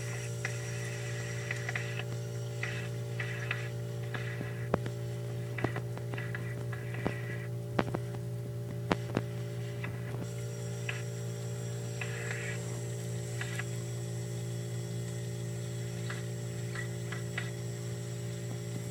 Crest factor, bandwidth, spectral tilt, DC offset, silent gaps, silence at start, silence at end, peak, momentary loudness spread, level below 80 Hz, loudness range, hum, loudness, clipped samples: 30 dB; 18 kHz; -5.5 dB/octave; under 0.1%; none; 0 s; 0 s; -6 dBFS; 4 LU; -60 dBFS; 2 LU; none; -37 LUFS; under 0.1%